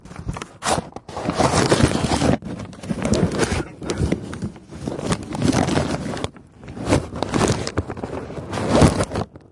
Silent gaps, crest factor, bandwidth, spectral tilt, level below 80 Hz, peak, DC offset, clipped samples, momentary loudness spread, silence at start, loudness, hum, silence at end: none; 20 dB; 11.5 kHz; -5.5 dB/octave; -36 dBFS; 0 dBFS; under 0.1%; under 0.1%; 15 LU; 0.05 s; -22 LUFS; none; 0.15 s